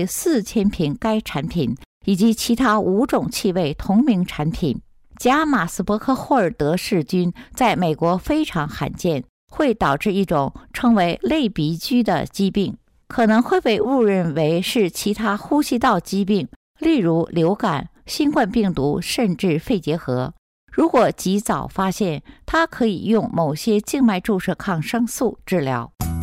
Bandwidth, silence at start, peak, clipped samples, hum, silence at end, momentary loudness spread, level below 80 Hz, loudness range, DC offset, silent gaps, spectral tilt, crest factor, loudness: 16 kHz; 0 s; -8 dBFS; under 0.1%; none; 0 s; 7 LU; -44 dBFS; 2 LU; under 0.1%; 1.86-2.01 s, 9.29-9.47 s, 16.56-16.75 s, 20.38-20.67 s; -5.5 dB/octave; 12 dB; -20 LUFS